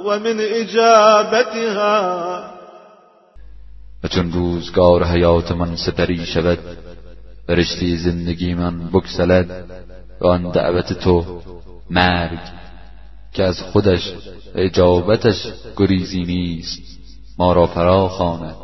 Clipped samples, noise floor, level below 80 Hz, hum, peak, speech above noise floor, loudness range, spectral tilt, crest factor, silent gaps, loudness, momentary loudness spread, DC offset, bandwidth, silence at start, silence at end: under 0.1%; -48 dBFS; -36 dBFS; none; 0 dBFS; 32 dB; 4 LU; -6 dB/octave; 18 dB; none; -17 LUFS; 15 LU; 1%; 6.2 kHz; 0 s; 0 s